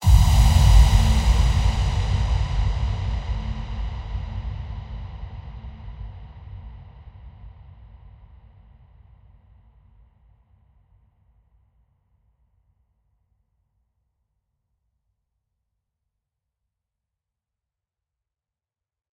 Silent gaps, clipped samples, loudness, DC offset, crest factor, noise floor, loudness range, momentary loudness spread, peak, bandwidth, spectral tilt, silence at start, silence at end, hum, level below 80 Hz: none; under 0.1%; -22 LUFS; under 0.1%; 22 dB; -90 dBFS; 26 LU; 26 LU; -2 dBFS; 15.5 kHz; -5.5 dB/octave; 0 s; 11.65 s; none; -26 dBFS